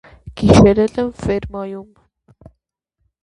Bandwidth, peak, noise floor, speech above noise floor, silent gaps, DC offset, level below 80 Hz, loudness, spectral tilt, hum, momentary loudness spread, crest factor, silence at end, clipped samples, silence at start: 11 kHz; 0 dBFS; -72 dBFS; 58 dB; none; under 0.1%; -34 dBFS; -14 LUFS; -7 dB/octave; none; 21 LU; 18 dB; 1.4 s; under 0.1%; 0.25 s